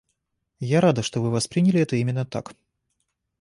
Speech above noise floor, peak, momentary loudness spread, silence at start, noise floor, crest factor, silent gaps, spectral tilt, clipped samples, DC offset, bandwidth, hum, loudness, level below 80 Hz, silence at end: 54 dB; -6 dBFS; 12 LU; 0.6 s; -76 dBFS; 18 dB; none; -6 dB/octave; under 0.1%; under 0.1%; 11.5 kHz; none; -22 LUFS; -60 dBFS; 0.9 s